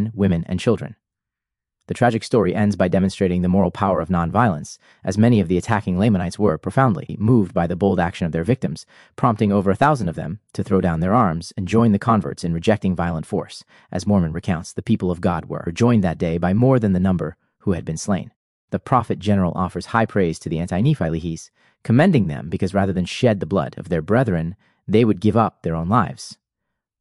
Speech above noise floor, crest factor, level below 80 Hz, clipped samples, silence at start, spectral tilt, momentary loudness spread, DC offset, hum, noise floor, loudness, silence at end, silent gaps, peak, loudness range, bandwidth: 66 dB; 20 dB; -48 dBFS; under 0.1%; 0 s; -7.5 dB/octave; 11 LU; under 0.1%; none; -85 dBFS; -20 LUFS; 0.65 s; 18.36-18.68 s; 0 dBFS; 3 LU; 11.5 kHz